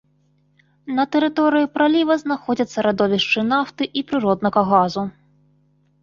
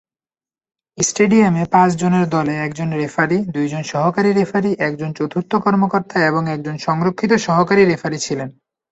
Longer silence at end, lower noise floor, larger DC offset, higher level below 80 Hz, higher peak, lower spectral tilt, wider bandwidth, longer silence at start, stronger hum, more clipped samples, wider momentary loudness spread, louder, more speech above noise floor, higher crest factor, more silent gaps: first, 0.95 s vs 0.4 s; second, -61 dBFS vs under -90 dBFS; neither; about the same, -58 dBFS vs -56 dBFS; about the same, -2 dBFS vs -2 dBFS; about the same, -6 dB/octave vs -5.5 dB/octave; second, 7.4 kHz vs 8.2 kHz; about the same, 0.85 s vs 0.95 s; first, 50 Hz at -45 dBFS vs none; neither; about the same, 7 LU vs 8 LU; about the same, -19 LUFS vs -17 LUFS; second, 42 dB vs over 74 dB; about the same, 18 dB vs 16 dB; neither